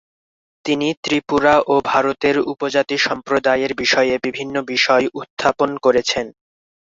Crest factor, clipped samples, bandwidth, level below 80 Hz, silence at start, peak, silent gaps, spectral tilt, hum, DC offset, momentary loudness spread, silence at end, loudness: 18 dB; under 0.1%; 7.8 kHz; -54 dBFS; 0.65 s; -2 dBFS; 0.97-1.03 s, 5.30-5.37 s; -3.5 dB/octave; none; under 0.1%; 8 LU; 0.65 s; -17 LUFS